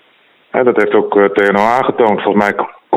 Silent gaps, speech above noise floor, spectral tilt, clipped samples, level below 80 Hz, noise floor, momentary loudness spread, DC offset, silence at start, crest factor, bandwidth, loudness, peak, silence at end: none; 39 dB; -6.5 dB/octave; under 0.1%; -54 dBFS; -51 dBFS; 5 LU; under 0.1%; 0.55 s; 12 dB; 9.8 kHz; -12 LUFS; 0 dBFS; 0 s